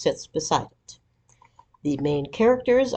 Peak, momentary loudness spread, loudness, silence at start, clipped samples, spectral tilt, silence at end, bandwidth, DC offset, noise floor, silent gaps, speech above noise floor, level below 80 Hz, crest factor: -6 dBFS; 10 LU; -24 LUFS; 0 s; under 0.1%; -5 dB/octave; 0 s; 8.6 kHz; under 0.1%; -60 dBFS; none; 38 dB; -54 dBFS; 20 dB